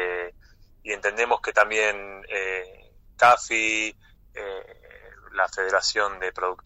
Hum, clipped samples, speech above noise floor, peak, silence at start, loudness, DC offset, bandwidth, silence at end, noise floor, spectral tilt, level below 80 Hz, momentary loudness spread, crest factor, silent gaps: none; under 0.1%; 28 dB; -6 dBFS; 0 s; -23 LUFS; under 0.1%; 15 kHz; 0.1 s; -53 dBFS; -1 dB/octave; -54 dBFS; 18 LU; 20 dB; none